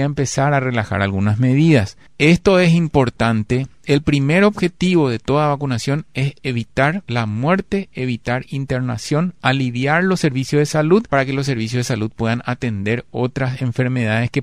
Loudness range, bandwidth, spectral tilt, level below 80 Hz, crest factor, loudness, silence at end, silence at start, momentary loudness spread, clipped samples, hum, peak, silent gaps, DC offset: 5 LU; 13 kHz; -6.5 dB/octave; -42 dBFS; 16 dB; -18 LUFS; 0 s; 0 s; 8 LU; under 0.1%; none; 0 dBFS; none; 0.5%